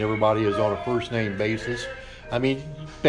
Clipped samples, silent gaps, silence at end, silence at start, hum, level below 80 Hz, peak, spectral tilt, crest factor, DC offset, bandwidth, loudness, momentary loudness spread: under 0.1%; none; 0 s; 0 s; none; -48 dBFS; -6 dBFS; -6.5 dB/octave; 18 dB; under 0.1%; 10.5 kHz; -25 LUFS; 11 LU